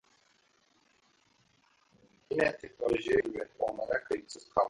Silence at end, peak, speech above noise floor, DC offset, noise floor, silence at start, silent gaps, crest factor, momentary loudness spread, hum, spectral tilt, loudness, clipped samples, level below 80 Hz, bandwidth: 0 s; -14 dBFS; 38 dB; under 0.1%; -70 dBFS; 2.3 s; none; 22 dB; 8 LU; none; -5 dB/octave; -33 LUFS; under 0.1%; -62 dBFS; 11 kHz